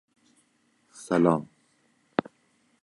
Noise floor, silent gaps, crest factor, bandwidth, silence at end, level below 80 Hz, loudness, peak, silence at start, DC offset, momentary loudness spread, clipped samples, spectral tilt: -68 dBFS; none; 24 dB; 11.5 kHz; 1.4 s; -68 dBFS; -27 LUFS; -6 dBFS; 1 s; under 0.1%; 22 LU; under 0.1%; -7 dB/octave